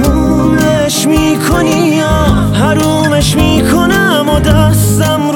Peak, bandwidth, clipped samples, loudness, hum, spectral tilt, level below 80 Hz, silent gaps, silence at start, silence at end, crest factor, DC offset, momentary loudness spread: 0 dBFS; 19.5 kHz; under 0.1%; -9 LUFS; none; -5 dB/octave; -20 dBFS; none; 0 s; 0 s; 8 dB; under 0.1%; 2 LU